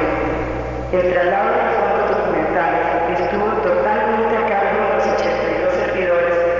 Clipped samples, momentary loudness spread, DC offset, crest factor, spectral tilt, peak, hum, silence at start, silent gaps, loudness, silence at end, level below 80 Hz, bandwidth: under 0.1%; 3 LU; 0.2%; 12 dB; -6.5 dB/octave; -6 dBFS; none; 0 s; none; -18 LUFS; 0 s; -36 dBFS; 7.4 kHz